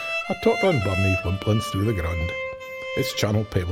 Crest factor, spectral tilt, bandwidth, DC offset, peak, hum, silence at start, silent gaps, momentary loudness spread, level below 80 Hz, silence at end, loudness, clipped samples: 16 dB; -6 dB/octave; 16.5 kHz; under 0.1%; -6 dBFS; none; 0 s; none; 8 LU; -40 dBFS; 0 s; -24 LUFS; under 0.1%